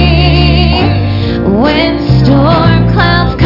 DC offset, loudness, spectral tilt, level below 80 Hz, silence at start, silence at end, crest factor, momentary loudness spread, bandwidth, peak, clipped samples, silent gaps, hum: under 0.1%; -8 LUFS; -8.5 dB/octave; -18 dBFS; 0 s; 0 s; 8 dB; 4 LU; 5.8 kHz; 0 dBFS; under 0.1%; none; none